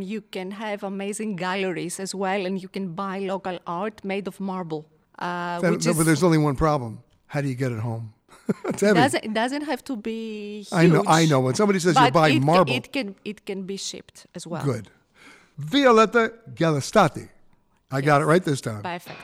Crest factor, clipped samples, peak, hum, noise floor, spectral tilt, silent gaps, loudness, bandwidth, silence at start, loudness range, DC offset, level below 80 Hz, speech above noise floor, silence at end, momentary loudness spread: 18 dB; under 0.1%; -6 dBFS; none; -58 dBFS; -5.5 dB/octave; none; -23 LUFS; 16 kHz; 0 s; 9 LU; under 0.1%; -52 dBFS; 35 dB; 0 s; 15 LU